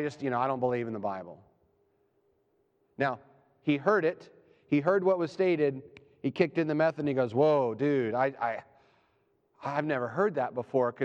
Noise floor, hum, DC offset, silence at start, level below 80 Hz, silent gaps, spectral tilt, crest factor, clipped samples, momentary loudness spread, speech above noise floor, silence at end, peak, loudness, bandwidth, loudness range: -72 dBFS; none; under 0.1%; 0 s; -76 dBFS; none; -8 dB/octave; 20 dB; under 0.1%; 11 LU; 44 dB; 0 s; -10 dBFS; -29 LUFS; 8.2 kHz; 6 LU